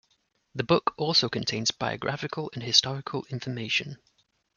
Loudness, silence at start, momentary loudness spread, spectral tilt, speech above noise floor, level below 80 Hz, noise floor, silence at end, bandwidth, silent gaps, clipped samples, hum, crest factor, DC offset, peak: -26 LUFS; 0.55 s; 12 LU; -3.5 dB/octave; 43 dB; -64 dBFS; -72 dBFS; 0.6 s; 12 kHz; none; under 0.1%; none; 24 dB; under 0.1%; -4 dBFS